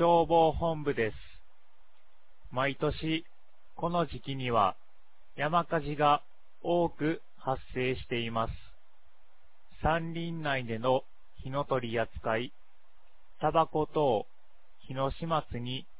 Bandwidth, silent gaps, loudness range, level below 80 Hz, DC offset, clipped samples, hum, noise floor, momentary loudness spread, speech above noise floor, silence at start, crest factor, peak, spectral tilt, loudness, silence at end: 4 kHz; none; 4 LU; -50 dBFS; 0.8%; under 0.1%; none; -67 dBFS; 10 LU; 37 dB; 0 s; 20 dB; -12 dBFS; -4.5 dB/octave; -31 LUFS; 0.15 s